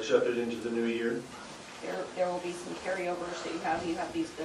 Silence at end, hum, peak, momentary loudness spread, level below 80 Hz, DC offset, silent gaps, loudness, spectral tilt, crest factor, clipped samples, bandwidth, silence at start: 0 s; none; -14 dBFS; 8 LU; -66 dBFS; under 0.1%; none; -33 LUFS; -4.5 dB/octave; 20 dB; under 0.1%; 12.5 kHz; 0 s